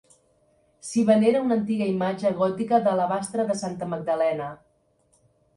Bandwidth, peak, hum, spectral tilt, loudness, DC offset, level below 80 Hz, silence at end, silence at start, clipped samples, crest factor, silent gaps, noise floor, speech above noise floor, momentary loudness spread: 11.5 kHz; -6 dBFS; none; -6 dB/octave; -24 LUFS; under 0.1%; -66 dBFS; 1 s; 0.85 s; under 0.1%; 18 dB; none; -65 dBFS; 42 dB; 11 LU